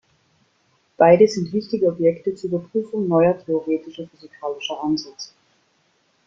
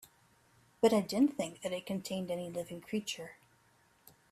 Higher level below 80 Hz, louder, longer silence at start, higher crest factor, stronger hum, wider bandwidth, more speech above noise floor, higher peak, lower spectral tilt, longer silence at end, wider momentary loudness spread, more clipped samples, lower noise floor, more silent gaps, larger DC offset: first, -62 dBFS vs -74 dBFS; first, -20 LUFS vs -35 LUFS; first, 1 s vs 0.8 s; about the same, 20 dB vs 22 dB; neither; second, 7.6 kHz vs 15 kHz; first, 44 dB vs 35 dB; first, -2 dBFS vs -14 dBFS; first, -6.5 dB/octave vs -5 dB/octave; about the same, 1 s vs 1 s; first, 21 LU vs 12 LU; neither; second, -64 dBFS vs -69 dBFS; neither; neither